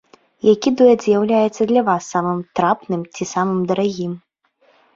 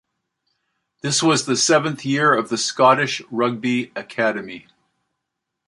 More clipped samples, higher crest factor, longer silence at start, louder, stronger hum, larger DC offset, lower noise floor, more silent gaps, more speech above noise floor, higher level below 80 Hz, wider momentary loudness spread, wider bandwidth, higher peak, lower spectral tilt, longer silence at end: neither; about the same, 16 dB vs 20 dB; second, 0.45 s vs 1.05 s; about the same, -18 LUFS vs -19 LUFS; neither; neither; second, -59 dBFS vs -80 dBFS; neither; second, 42 dB vs 61 dB; first, -60 dBFS vs -68 dBFS; second, 11 LU vs 14 LU; second, 7.6 kHz vs 11.5 kHz; about the same, -2 dBFS vs -2 dBFS; first, -6 dB/octave vs -3.5 dB/octave; second, 0.75 s vs 1.1 s